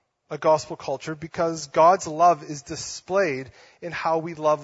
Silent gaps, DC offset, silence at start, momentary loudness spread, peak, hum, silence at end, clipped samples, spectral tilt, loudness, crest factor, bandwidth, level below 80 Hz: none; under 0.1%; 0.3 s; 15 LU; -6 dBFS; none; 0 s; under 0.1%; -4.5 dB/octave; -23 LUFS; 18 dB; 8 kHz; -62 dBFS